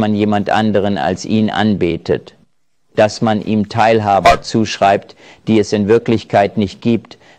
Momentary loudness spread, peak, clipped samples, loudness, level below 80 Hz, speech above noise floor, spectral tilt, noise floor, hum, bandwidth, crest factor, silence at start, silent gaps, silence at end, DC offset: 7 LU; 0 dBFS; under 0.1%; -14 LUFS; -40 dBFS; 50 dB; -6 dB/octave; -64 dBFS; none; 10 kHz; 14 dB; 0 s; none; 0.4 s; 0.1%